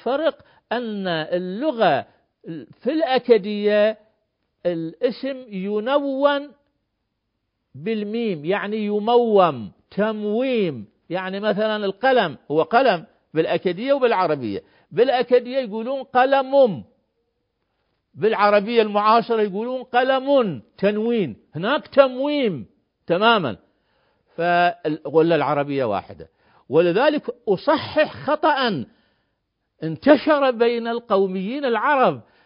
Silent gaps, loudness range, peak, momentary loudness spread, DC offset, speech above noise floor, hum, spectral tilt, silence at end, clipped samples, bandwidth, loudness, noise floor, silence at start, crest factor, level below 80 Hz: none; 4 LU; 0 dBFS; 11 LU; under 0.1%; 56 dB; none; -10.5 dB/octave; 0.25 s; under 0.1%; 5.4 kHz; -20 LUFS; -76 dBFS; 0.05 s; 20 dB; -64 dBFS